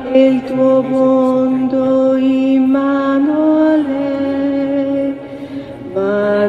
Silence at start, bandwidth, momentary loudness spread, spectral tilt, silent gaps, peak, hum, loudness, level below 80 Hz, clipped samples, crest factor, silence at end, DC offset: 0 s; 5.8 kHz; 9 LU; -8 dB/octave; none; 0 dBFS; none; -14 LUFS; -52 dBFS; under 0.1%; 12 dB; 0 s; under 0.1%